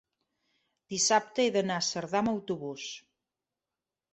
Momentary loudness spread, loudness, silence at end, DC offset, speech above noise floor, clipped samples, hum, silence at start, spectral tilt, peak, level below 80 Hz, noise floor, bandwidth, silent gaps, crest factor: 14 LU; -29 LUFS; 1.15 s; under 0.1%; over 60 dB; under 0.1%; none; 0.9 s; -3 dB/octave; -12 dBFS; -72 dBFS; under -90 dBFS; 8.2 kHz; none; 22 dB